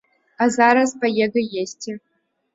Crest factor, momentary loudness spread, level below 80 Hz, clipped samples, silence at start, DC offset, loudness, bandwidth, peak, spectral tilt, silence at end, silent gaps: 18 dB; 17 LU; -66 dBFS; under 0.1%; 0.4 s; under 0.1%; -19 LUFS; 8 kHz; -2 dBFS; -4 dB/octave; 0.55 s; none